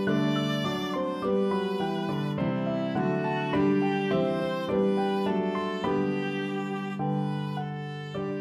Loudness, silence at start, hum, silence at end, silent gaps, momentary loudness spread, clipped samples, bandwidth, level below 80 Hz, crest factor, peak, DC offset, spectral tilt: -28 LUFS; 0 s; none; 0 s; none; 6 LU; under 0.1%; 13 kHz; -60 dBFS; 14 dB; -14 dBFS; under 0.1%; -7.5 dB/octave